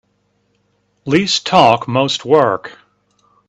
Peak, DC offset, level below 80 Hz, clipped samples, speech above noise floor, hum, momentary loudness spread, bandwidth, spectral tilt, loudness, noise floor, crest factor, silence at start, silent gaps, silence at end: 0 dBFS; under 0.1%; -56 dBFS; under 0.1%; 49 dB; 50 Hz at -45 dBFS; 14 LU; 8.8 kHz; -4.5 dB/octave; -14 LUFS; -63 dBFS; 16 dB; 1.05 s; none; 0.75 s